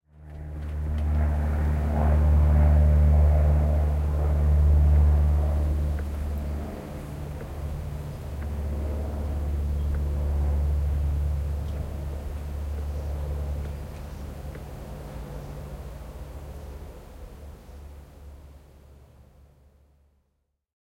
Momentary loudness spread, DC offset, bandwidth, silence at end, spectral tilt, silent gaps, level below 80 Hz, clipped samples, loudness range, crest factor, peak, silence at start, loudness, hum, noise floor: 21 LU; under 0.1%; 4.7 kHz; 2.2 s; -8.5 dB/octave; none; -28 dBFS; under 0.1%; 19 LU; 14 dB; -10 dBFS; 0.15 s; -26 LUFS; none; -75 dBFS